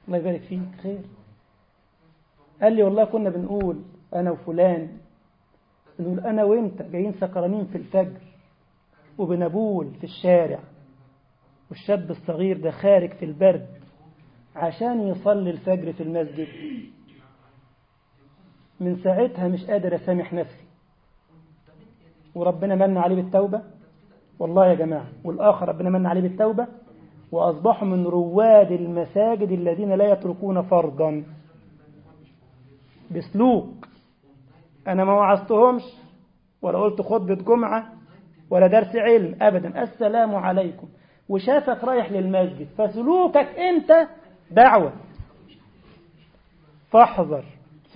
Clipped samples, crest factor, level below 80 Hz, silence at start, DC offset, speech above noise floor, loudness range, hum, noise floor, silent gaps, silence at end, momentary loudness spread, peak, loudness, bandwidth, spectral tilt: under 0.1%; 22 dB; -60 dBFS; 0.05 s; under 0.1%; 42 dB; 8 LU; none; -62 dBFS; none; 0.45 s; 14 LU; -2 dBFS; -21 LUFS; 5.2 kHz; -12 dB/octave